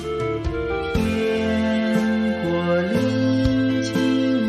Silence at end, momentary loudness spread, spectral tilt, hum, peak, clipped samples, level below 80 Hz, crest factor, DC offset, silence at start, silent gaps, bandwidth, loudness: 0 s; 5 LU; -6.5 dB/octave; none; -6 dBFS; under 0.1%; -38 dBFS; 14 dB; under 0.1%; 0 s; none; 13.5 kHz; -21 LUFS